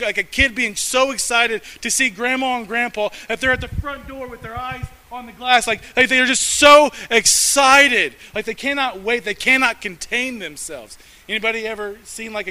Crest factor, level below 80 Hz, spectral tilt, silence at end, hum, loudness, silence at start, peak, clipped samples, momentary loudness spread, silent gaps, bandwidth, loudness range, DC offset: 18 dB; -42 dBFS; -1.5 dB/octave; 0 s; none; -16 LUFS; 0 s; 0 dBFS; 0.1%; 19 LU; none; 16 kHz; 9 LU; under 0.1%